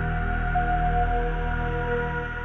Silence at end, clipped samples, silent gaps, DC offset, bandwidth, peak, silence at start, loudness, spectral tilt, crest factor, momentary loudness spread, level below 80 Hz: 0 s; under 0.1%; none; under 0.1%; 4 kHz; -12 dBFS; 0 s; -26 LUFS; -8.5 dB/octave; 12 dB; 4 LU; -28 dBFS